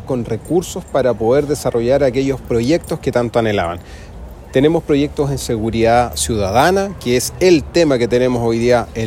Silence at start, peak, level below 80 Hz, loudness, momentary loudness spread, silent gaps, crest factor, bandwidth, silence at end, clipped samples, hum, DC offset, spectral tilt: 0 s; 0 dBFS; -34 dBFS; -16 LUFS; 7 LU; none; 14 dB; 16.5 kHz; 0 s; under 0.1%; none; under 0.1%; -5.5 dB/octave